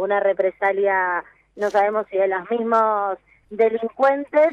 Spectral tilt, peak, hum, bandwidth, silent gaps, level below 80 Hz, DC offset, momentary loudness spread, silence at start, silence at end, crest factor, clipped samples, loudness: -6 dB/octave; -6 dBFS; none; 8 kHz; none; -66 dBFS; under 0.1%; 9 LU; 0 s; 0 s; 14 dB; under 0.1%; -20 LUFS